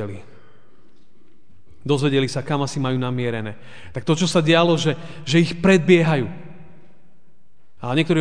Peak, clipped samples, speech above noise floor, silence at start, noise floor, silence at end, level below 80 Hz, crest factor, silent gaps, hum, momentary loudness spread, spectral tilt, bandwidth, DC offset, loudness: -2 dBFS; under 0.1%; 43 dB; 0 s; -62 dBFS; 0 s; -56 dBFS; 20 dB; none; none; 18 LU; -6 dB/octave; 10 kHz; 2%; -19 LUFS